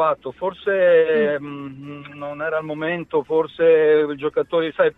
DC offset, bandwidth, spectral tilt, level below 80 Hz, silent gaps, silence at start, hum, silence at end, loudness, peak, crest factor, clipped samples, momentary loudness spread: under 0.1%; 4 kHz; -8 dB/octave; -62 dBFS; none; 0 s; none; 0.05 s; -19 LUFS; -4 dBFS; 14 dB; under 0.1%; 17 LU